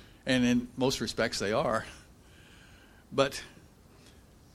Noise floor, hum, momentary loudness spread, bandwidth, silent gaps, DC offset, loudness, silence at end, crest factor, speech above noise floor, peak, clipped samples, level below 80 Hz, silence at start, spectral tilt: -56 dBFS; none; 12 LU; 15 kHz; none; under 0.1%; -30 LUFS; 1.05 s; 22 dB; 27 dB; -10 dBFS; under 0.1%; -56 dBFS; 0 s; -4.5 dB/octave